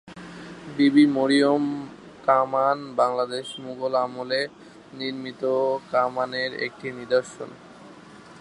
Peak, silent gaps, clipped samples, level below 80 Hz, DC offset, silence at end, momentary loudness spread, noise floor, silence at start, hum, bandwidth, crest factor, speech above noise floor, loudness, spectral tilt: -4 dBFS; none; under 0.1%; -68 dBFS; under 0.1%; 0 s; 20 LU; -46 dBFS; 0.05 s; none; 11 kHz; 20 dB; 23 dB; -24 LUFS; -5.5 dB/octave